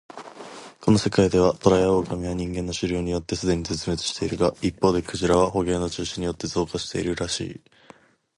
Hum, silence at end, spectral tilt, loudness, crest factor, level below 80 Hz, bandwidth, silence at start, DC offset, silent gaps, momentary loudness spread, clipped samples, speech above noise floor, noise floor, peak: none; 0.8 s; -5.5 dB/octave; -24 LUFS; 22 dB; -42 dBFS; 11.5 kHz; 0.15 s; under 0.1%; none; 9 LU; under 0.1%; 30 dB; -53 dBFS; -2 dBFS